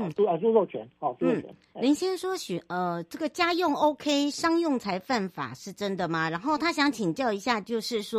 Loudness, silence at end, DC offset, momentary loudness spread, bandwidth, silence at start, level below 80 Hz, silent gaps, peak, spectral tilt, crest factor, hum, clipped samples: -28 LUFS; 0 s; under 0.1%; 9 LU; 15 kHz; 0 s; -68 dBFS; none; -10 dBFS; -4.5 dB/octave; 18 dB; none; under 0.1%